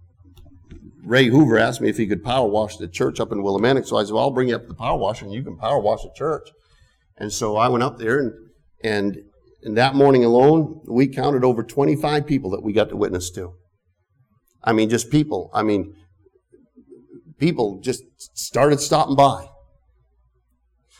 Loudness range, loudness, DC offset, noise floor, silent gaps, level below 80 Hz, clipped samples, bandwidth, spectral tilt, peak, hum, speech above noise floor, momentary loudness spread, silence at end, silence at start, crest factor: 6 LU; -20 LUFS; under 0.1%; -67 dBFS; none; -48 dBFS; under 0.1%; 15.5 kHz; -5.5 dB/octave; -4 dBFS; none; 48 dB; 14 LU; 1.55 s; 0.4 s; 16 dB